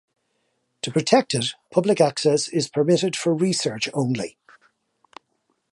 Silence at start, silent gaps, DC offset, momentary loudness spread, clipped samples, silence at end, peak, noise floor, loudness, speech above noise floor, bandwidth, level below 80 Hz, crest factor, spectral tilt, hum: 0.85 s; none; under 0.1%; 7 LU; under 0.1%; 1.45 s; -4 dBFS; -72 dBFS; -21 LUFS; 50 dB; 11.5 kHz; -66 dBFS; 20 dB; -4.5 dB/octave; none